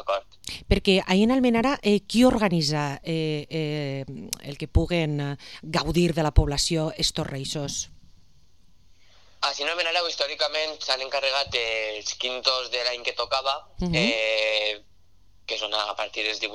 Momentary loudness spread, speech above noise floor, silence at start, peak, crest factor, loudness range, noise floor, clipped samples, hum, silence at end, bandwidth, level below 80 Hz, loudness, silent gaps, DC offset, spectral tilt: 10 LU; 36 dB; 0 s; -4 dBFS; 22 dB; 6 LU; -60 dBFS; under 0.1%; none; 0 s; 14 kHz; -38 dBFS; -25 LUFS; none; 0.2%; -4.5 dB/octave